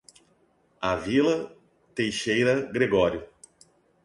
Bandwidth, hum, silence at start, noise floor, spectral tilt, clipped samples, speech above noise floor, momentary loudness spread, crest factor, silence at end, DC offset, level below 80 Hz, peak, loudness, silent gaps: 11.5 kHz; none; 0.8 s; -65 dBFS; -5 dB/octave; under 0.1%; 41 dB; 12 LU; 18 dB; 0.8 s; under 0.1%; -54 dBFS; -10 dBFS; -25 LUFS; none